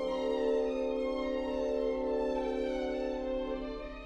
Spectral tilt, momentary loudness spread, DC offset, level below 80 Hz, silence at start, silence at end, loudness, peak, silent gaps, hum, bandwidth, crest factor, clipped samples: -6 dB/octave; 5 LU; under 0.1%; -50 dBFS; 0 s; 0 s; -34 LUFS; -22 dBFS; none; none; 9 kHz; 12 dB; under 0.1%